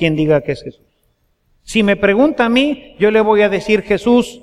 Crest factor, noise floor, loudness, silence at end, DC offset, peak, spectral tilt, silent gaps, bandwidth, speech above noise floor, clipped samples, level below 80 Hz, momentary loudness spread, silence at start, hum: 14 dB; -61 dBFS; -14 LUFS; 0.05 s; under 0.1%; 0 dBFS; -6 dB/octave; none; 12.5 kHz; 48 dB; under 0.1%; -42 dBFS; 7 LU; 0 s; none